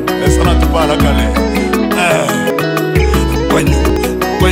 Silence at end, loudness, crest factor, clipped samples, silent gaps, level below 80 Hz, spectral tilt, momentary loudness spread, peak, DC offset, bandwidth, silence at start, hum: 0 s; -12 LUFS; 12 dB; under 0.1%; none; -18 dBFS; -5.5 dB/octave; 3 LU; 0 dBFS; under 0.1%; 16.5 kHz; 0 s; none